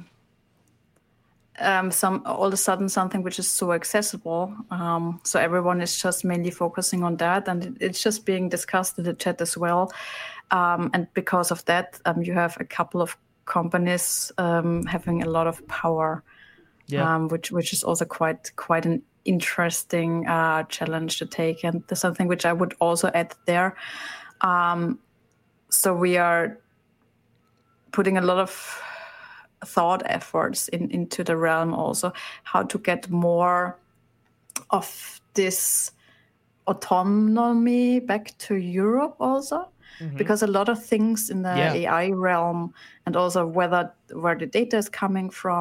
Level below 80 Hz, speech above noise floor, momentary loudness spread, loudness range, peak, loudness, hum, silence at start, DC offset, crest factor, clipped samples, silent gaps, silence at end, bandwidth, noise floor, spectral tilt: -62 dBFS; 41 dB; 9 LU; 2 LU; -6 dBFS; -24 LUFS; none; 0 s; under 0.1%; 20 dB; under 0.1%; none; 0 s; 16.5 kHz; -65 dBFS; -4.5 dB/octave